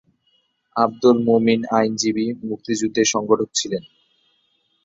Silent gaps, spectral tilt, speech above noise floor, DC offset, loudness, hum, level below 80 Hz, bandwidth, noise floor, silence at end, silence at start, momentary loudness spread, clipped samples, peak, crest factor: none; -4 dB/octave; 47 dB; under 0.1%; -20 LUFS; none; -62 dBFS; 8 kHz; -66 dBFS; 1.05 s; 0.75 s; 10 LU; under 0.1%; -2 dBFS; 18 dB